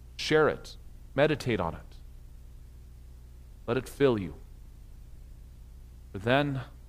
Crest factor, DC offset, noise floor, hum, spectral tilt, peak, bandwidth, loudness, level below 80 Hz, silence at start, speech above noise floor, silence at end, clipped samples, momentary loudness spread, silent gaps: 24 dB; under 0.1%; -48 dBFS; 60 Hz at -50 dBFS; -6 dB/octave; -8 dBFS; 15.5 kHz; -29 LUFS; -48 dBFS; 0 s; 21 dB; 0 s; under 0.1%; 25 LU; none